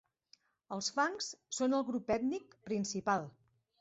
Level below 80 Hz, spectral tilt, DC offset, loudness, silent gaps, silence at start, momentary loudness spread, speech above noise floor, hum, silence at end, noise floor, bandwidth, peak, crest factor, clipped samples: -72 dBFS; -3.5 dB/octave; under 0.1%; -36 LUFS; none; 0.7 s; 9 LU; 34 dB; none; 0.5 s; -70 dBFS; 8 kHz; -20 dBFS; 18 dB; under 0.1%